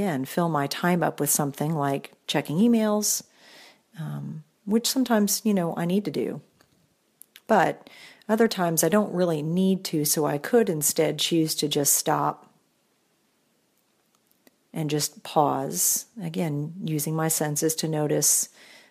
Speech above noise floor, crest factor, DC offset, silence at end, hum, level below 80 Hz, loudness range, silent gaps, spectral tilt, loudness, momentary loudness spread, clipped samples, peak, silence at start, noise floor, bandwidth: 44 dB; 20 dB; under 0.1%; 0.45 s; none; -72 dBFS; 4 LU; none; -4 dB/octave; -24 LUFS; 11 LU; under 0.1%; -6 dBFS; 0 s; -68 dBFS; 15.5 kHz